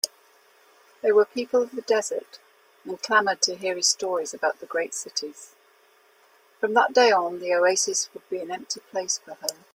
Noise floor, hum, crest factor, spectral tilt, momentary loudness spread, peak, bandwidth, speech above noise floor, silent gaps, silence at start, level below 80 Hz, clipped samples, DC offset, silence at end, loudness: -59 dBFS; none; 22 dB; -0.5 dB/octave; 12 LU; -4 dBFS; 16.5 kHz; 35 dB; none; 0.05 s; -78 dBFS; under 0.1%; under 0.1%; 0.2 s; -24 LUFS